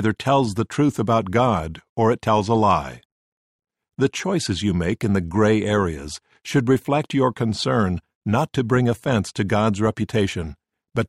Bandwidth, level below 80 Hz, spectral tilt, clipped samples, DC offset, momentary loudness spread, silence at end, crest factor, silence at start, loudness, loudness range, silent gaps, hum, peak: 14 kHz; -46 dBFS; -6.5 dB/octave; under 0.1%; under 0.1%; 8 LU; 0 s; 16 dB; 0 s; -21 LUFS; 2 LU; 1.89-1.96 s, 3.05-3.59 s, 8.15-8.21 s; none; -6 dBFS